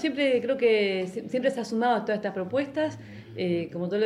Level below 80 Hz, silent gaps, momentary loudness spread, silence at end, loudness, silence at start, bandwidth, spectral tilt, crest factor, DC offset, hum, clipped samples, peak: -70 dBFS; none; 8 LU; 0 s; -27 LUFS; 0 s; 11.5 kHz; -6 dB/octave; 14 dB; under 0.1%; none; under 0.1%; -12 dBFS